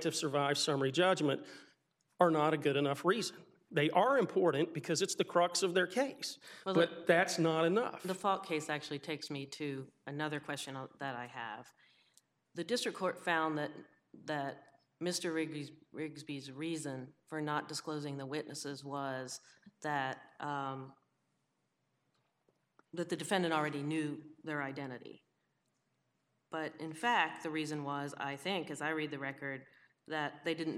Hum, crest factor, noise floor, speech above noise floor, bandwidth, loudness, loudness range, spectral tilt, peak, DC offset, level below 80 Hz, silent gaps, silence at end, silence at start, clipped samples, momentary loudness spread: none; 22 dB; -82 dBFS; 46 dB; 15.5 kHz; -36 LUFS; 10 LU; -4.5 dB/octave; -14 dBFS; under 0.1%; under -90 dBFS; none; 0 s; 0 s; under 0.1%; 14 LU